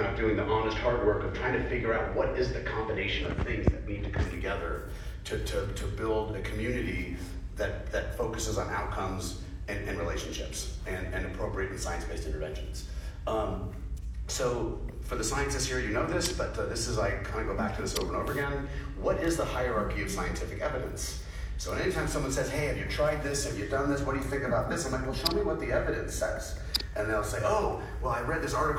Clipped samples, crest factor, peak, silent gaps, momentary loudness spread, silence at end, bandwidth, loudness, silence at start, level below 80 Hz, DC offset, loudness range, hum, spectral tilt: under 0.1%; 20 dB; -10 dBFS; none; 8 LU; 0 s; 16.5 kHz; -32 LUFS; 0 s; -38 dBFS; under 0.1%; 5 LU; none; -4.5 dB/octave